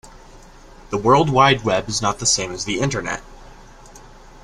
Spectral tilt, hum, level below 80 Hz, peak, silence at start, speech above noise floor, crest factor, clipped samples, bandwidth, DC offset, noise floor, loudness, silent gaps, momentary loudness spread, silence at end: -3.5 dB/octave; none; -42 dBFS; -2 dBFS; 0.05 s; 25 dB; 20 dB; under 0.1%; 13 kHz; under 0.1%; -43 dBFS; -18 LUFS; none; 12 LU; 0.05 s